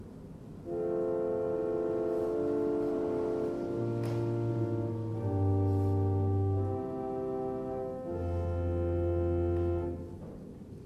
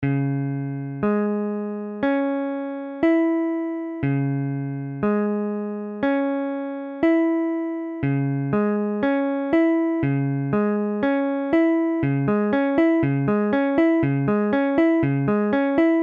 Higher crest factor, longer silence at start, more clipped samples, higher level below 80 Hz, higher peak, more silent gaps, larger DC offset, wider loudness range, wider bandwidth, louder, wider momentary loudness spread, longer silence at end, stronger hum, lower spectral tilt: about the same, 12 dB vs 14 dB; about the same, 0 s vs 0 s; neither; about the same, -50 dBFS vs -54 dBFS; second, -20 dBFS vs -8 dBFS; neither; neither; about the same, 2 LU vs 4 LU; first, 6.2 kHz vs 4.6 kHz; second, -33 LUFS vs -22 LUFS; about the same, 9 LU vs 8 LU; about the same, 0 s vs 0 s; neither; about the same, -10.5 dB/octave vs -10.5 dB/octave